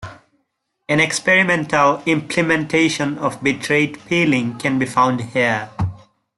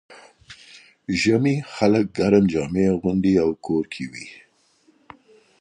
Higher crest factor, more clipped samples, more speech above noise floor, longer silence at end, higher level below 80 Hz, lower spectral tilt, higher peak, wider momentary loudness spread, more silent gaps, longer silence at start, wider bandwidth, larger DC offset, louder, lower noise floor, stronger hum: about the same, 16 dB vs 18 dB; neither; first, 54 dB vs 40 dB; second, 0.4 s vs 1.25 s; about the same, -52 dBFS vs -50 dBFS; second, -4.5 dB/octave vs -6.5 dB/octave; about the same, -2 dBFS vs -4 dBFS; second, 7 LU vs 19 LU; neither; about the same, 0 s vs 0.1 s; first, 12 kHz vs 10.5 kHz; neither; first, -17 LUFS vs -21 LUFS; first, -71 dBFS vs -60 dBFS; neither